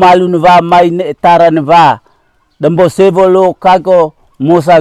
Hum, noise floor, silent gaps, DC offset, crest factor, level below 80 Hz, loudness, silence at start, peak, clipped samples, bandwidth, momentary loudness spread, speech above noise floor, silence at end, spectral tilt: none; -52 dBFS; none; under 0.1%; 8 dB; -44 dBFS; -7 LUFS; 0 s; 0 dBFS; under 0.1%; 13 kHz; 7 LU; 46 dB; 0 s; -6.5 dB/octave